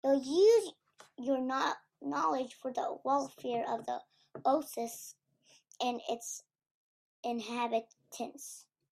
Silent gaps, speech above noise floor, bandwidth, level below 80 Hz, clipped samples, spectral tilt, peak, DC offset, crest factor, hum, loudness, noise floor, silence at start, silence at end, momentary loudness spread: 6.71-7.23 s; 35 dB; 15.5 kHz; -84 dBFS; under 0.1%; -3 dB/octave; -16 dBFS; under 0.1%; 18 dB; none; -34 LUFS; -68 dBFS; 0.05 s; 0.3 s; 16 LU